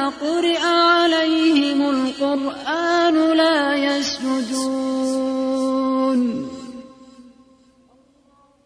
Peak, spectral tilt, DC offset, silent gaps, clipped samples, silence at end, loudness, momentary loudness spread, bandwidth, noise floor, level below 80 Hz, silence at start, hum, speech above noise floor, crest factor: -6 dBFS; -3 dB/octave; under 0.1%; none; under 0.1%; 1.4 s; -19 LUFS; 8 LU; 10.5 kHz; -56 dBFS; -60 dBFS; 0 s; none; 37 dB; 14 dB